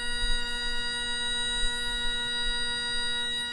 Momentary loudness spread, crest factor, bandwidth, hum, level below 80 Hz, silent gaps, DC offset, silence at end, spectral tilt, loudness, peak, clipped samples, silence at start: 2 LU; 14 dB; 11 kHz; none; -36 dBFS; none; under 0.1%; 0 s; -0.5 dB/octave; -28 LUFS; -14 dBFS; under 0.1%; 0 s